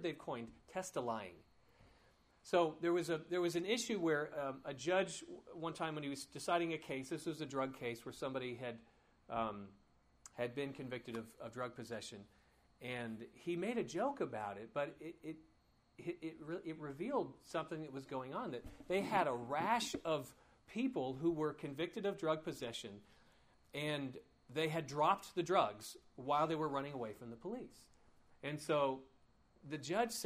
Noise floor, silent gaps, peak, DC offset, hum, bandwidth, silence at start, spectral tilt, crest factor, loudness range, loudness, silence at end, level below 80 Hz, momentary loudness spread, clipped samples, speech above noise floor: -71 dBFS; none; -18 dBFS; under 0.1%; none; 15.5 kHz; 0 s; -5 dB/octave; 22 dB; 7 LU; -41 LUFS; 0 s; -74 dBFS; 14 LU; under 0.1%; 30 dB